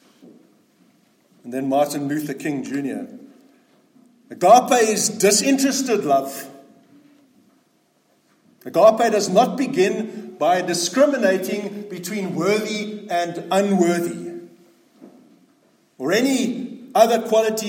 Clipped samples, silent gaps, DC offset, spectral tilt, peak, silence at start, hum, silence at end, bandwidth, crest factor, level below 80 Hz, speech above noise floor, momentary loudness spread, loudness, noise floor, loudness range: under 0.1%; none; under 0.1%; -4 dB/octave; -2 dBFS; 1.45 s; none; 0 s; 16.5 kHz; 20 dB; -74 dBFS; 44 dB; 16 LU; -19 LUFS; -62 dBFS; 8 LU